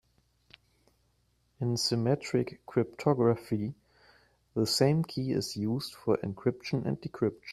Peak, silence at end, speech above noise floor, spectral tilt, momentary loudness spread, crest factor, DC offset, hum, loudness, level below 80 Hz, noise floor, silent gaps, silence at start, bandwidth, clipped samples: -10 dBFS; 0 s; 42 dB; -6 dB/octave; 8 LU; 20 dB; under 0.1%; none; -31 LUFS; -64 dBFS; -72 dBFS; none; 1.6 s; 14.5 kHz; under 0.1%